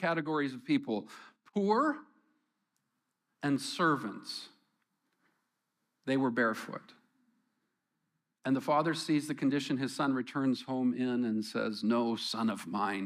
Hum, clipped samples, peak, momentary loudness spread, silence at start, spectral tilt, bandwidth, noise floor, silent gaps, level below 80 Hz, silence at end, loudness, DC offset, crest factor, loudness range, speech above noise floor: none; under 0.1%; -16 dBFS; 12 LU; 0 s; -5.5 dB/octave; 15 kHz; -83 dBFS; none; -86 dBFS; 0 s; -33 LUFS; under 0.1%; 18 dB; 5 LU; 51 dB